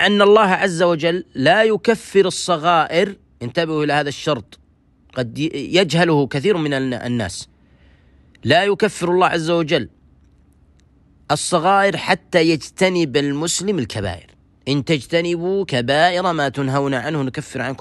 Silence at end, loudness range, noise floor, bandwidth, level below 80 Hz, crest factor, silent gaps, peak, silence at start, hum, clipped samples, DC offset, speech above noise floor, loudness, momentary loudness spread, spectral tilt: 0.05 s; 3 LU; -55 dBFS; 12.5 kHz; -52 dBFS; 18 dB; none; 0 dBFS; 0 s; none; under 0.1%; under 0.1%; 37 dB; -18 LUFS; 10 LU; -4.5 dB/octave